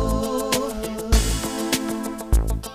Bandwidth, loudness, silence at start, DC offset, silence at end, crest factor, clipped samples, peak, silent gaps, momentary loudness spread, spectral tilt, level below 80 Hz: 15.5 kHz; -24 LUFS; 0 s; under 0.1%; 0 s; 18 dB; under 0.1%; -6 dBFS; none; 6 LU; -4.5 dB/octave; -26 dBFS